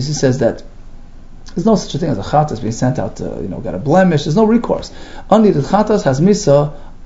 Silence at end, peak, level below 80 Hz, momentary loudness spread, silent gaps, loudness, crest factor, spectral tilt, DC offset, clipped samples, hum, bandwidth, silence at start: 0 s; 0 dBFS; -32 dBFS; 12 LU; none; -15 LUFS; 14 dB; -6.5 dB/octave; under 0.1%; under 0.1%; none; 8 kHz; 0 s